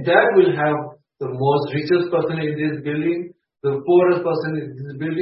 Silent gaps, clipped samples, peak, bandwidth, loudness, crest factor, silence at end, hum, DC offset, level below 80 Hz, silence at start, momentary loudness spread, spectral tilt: none; under 0.1%; -2 dBFS; 5.8 kHz; -20 LUFS; 18 dB; 0 s; none; under 0.1%; -62 dBFS; 0 s; 13 LU; -11.5 dB/octave